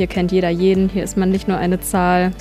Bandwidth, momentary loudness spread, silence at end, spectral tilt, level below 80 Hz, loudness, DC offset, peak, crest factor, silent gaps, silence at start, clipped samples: 15 kHz; 3 LU; 0 s; -6 dB/octave; -34 dBFS; -17 LUFS; under 0.1%; -4 dBFS; 14 dB; none; 0 s; under 0.1%